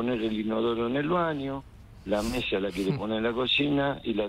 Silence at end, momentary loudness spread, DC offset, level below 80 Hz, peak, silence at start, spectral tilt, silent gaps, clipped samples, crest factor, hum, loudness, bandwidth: 0 s; 8 LU; under 0.1%; -50 dBFS; -14 dBFS; 0 s; -6 dB/octave; none; under 0.1%; 14 dB; none; -28 LUFS; 16 kHz